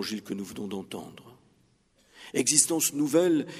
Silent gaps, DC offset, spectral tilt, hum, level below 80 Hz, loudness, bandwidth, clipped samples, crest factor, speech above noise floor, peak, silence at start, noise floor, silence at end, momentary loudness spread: none; under 0.1%; -3 dB/octave; none; -72 dBFS; -26 LUFS; 15.5 kHz; under 0.1%; 26 dB; 38 dB; -2 dBFS; 0 s; -66 dBFS; 0 s; 19 LU